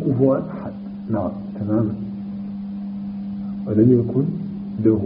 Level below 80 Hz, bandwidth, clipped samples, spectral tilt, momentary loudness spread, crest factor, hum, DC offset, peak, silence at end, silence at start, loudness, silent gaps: -52 dBFS; 5 kHz; under 0.1%; -11.5 dB/octave; 14 LU; 18 dB; none; under 0.1%; -4 dBFS; 0 s; 0 s; -22 LUFS; none